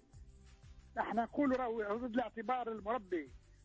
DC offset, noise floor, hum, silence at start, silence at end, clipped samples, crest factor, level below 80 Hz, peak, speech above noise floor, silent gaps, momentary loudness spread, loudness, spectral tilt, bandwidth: under 0.1%; -58 dBFS; none; 0.15 s; 0.1 s; under 0.1%; 16 dB; -62 dBFS; -24 dBFS; 21 dB; none; 8 LU; -38 LUFS; -7 dB/octave; 8 kHz